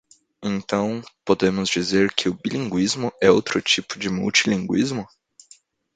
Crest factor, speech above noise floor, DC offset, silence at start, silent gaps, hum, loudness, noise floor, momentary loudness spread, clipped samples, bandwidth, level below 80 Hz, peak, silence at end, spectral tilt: 22 dB; 33 dB; under 0.1%; 0.4 s; none; none; -21 LUFS; -54 dBFS; 10 LU; under 0.1%; 9.4 kHz; -56 dBFS; 0 dBFS; 0.9 s; -4 dB/octave